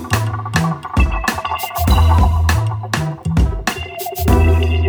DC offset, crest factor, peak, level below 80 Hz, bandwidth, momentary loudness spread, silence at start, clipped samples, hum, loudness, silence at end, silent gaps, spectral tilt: under 0.1%; 14 dB; 0 dBFS; -20 dBFS; over 20 kHz; 8 LU; 0 s; under 0.1%; none; -17 LUFS; 0 s; none; -5.5 dB/octave